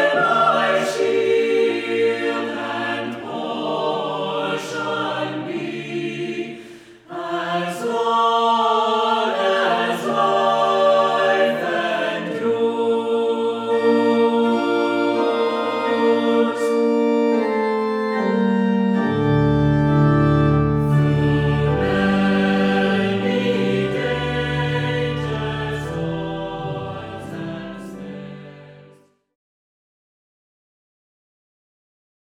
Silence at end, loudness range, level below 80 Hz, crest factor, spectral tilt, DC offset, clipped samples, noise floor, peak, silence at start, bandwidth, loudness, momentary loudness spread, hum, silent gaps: 3.4 s; 9 LU; -42 dBFS; 14 dB; -6.5 dB/octave; under 0.1%; under 0.1%; -52 dBFS; -6 dBFS; 0 s; 13 kHz; -19 LUFS; 11 LU; none; none